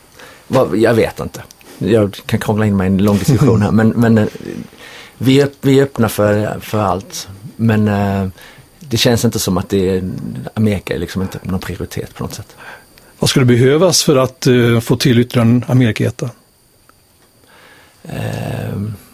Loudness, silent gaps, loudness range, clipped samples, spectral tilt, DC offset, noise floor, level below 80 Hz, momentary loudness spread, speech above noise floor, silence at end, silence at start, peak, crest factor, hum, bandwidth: -14 LUFS; none; 7 LU; under 0.1%; -5.5 dB/octave; under 0.1%; -51 dBFS; -38 dBFS; 15 LU; 37 dB; 0.15 s; 0.2 s; 0 dBFS; 14 dB; none; 16 kHz